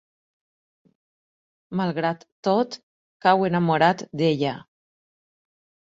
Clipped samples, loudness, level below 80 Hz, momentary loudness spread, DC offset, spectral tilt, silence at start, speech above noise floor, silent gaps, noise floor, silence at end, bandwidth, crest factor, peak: under 0.1%; -23 LUFS; -66 dBFS; 11 LU; under 0.1%; -6.5 dB/octave; 1.7 s; over 68 dB; 2.32-2.43 s, 2.83-3.20 s; under -90 dBFS; 1.25 s; 7.8 kHz; 22 dB; -2 dBFS